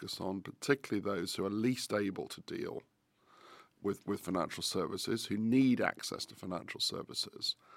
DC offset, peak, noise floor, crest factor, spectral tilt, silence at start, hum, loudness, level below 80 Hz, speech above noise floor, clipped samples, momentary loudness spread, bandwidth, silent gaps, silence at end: under 0.1%; -12 dBFS; -67 dBFS; 24 dB; -4.5 dB/octave; 0 s; none; -36 LUFS; -74 dBFS; 31 dB; under 0.1%; 11 LU; 16.5 kHz; none; 0 s